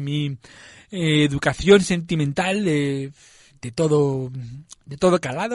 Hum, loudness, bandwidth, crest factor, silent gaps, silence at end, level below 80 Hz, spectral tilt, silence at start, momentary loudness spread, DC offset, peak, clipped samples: none; -20 LUFS; 11.5 kHz; 18 dB; none; 0 s; -48 dBFS; -5.5 dB/octave; 0 s; 20 LU; under 0.1%; -2 dBFS; under 0.1%